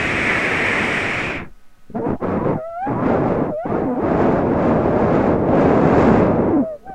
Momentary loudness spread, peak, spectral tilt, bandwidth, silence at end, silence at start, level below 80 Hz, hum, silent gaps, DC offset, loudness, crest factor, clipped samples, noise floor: 10 LU; 0 dBFS; -7 dB/octave; 11 kHz; 0 s; 0 s; -36 dBFS; none; none; under 0.1%; -17 LUFS; 16 dB; under 0.1%; -38 dBFS